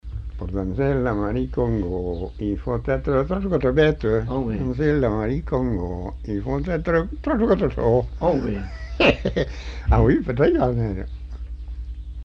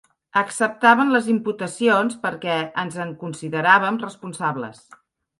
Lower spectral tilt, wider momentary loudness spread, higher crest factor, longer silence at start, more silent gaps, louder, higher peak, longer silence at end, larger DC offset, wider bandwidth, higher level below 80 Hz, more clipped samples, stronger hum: first, -8.5 dB/octave vs -4.5 dB/octave; about the same, 13 LU vs 14 LU; about the same, 18 dB vs 20 dB; second, 0.05 s vs 0.35 s; neither; about the same, -22 LUFS vs -20 LUFS; about the same, -4 dBFS vs -2 dBFS; second, 0 s vs 0.65 s; neither; second, 7 kHz vs 11.5 kHz; first, -30 dBFS vs -70 dBFS; neither; neither